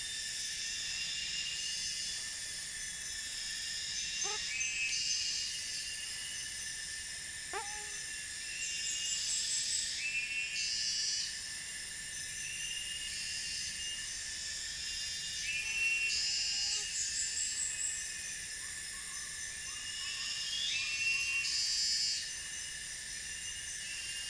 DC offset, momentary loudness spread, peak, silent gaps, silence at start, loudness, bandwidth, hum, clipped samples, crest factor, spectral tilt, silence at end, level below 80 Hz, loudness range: under 0.1%; 8 LU; -20 dBFS; none; 0 s; -35 LUFS; 10.5 kHz; none; under 0.1%; 18 dB; 2 dB/octave; 0 s; -62 dBFS; 4 LU